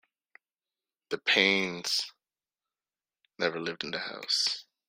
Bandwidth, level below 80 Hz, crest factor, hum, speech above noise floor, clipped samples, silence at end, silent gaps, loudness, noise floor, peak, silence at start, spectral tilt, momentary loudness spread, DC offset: 16 kHz; -76 dBFS; 26 dB; none; over 60 dB; under 0.1%; 0.25 s; none; -28 LUFS; under -90 dBFS; -6 dBFS; 1.1 s; -2 dB/octave; 12 LU; under 0.1%